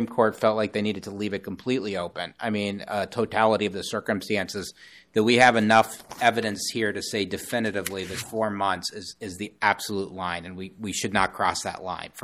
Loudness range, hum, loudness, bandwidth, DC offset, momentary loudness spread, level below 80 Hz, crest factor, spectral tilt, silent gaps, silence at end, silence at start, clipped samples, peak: 5 LU; none; -25 LUFS; 15 kHz; under 0.1%; 12 LU; -60 dBFS; 22 dB; -4 dB/octave; none; 0 s; 0 s; under 0.1%; -4 dBFS